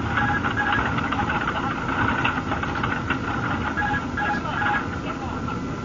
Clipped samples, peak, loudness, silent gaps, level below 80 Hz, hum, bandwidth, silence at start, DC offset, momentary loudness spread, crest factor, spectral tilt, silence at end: under 0.1%; -8 dBFS; -24 LUFS; none; -40 dBFS; none; 7.6 kHz; 0 s; under 0.1%; 7 LU; 16 dB; -6 dB/octave; 0 s